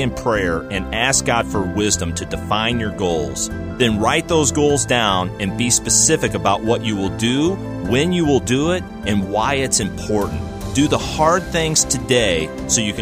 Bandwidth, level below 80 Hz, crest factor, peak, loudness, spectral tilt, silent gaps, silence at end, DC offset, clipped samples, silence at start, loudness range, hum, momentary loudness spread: 15.5 kHz; -36 dBFS; 16 dB; -2 dBFS; -18 LUFS; -3.5 dB/octave; none; 0 s; under 0.1%; under 0.1%; 0 s; 3 LU; none; 7 LU